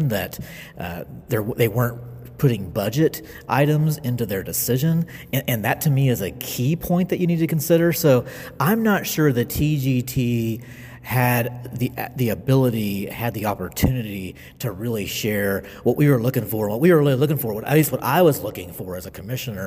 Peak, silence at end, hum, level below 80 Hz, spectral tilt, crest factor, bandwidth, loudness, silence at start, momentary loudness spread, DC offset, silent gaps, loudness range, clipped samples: -4 dBFS; 0 s; none; -44 dBFS; -6 dB/octave; 16 dB; 16 kHz; -21 LUFS; 0 s; 14 LU; under 0.1%; none; 4 LU; under 0.1%